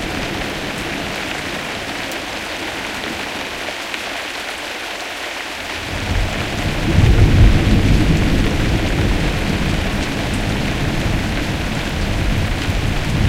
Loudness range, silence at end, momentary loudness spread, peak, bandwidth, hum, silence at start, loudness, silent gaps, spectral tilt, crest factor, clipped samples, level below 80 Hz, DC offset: 8 LU; 0 s; 9 LU; 0 dBFS; 16.5 kHz; none; 0 s; -19 LUFS; none; -5 dB/octave; 18 dB; under 0.1%; -22 dBFS; under 0.1%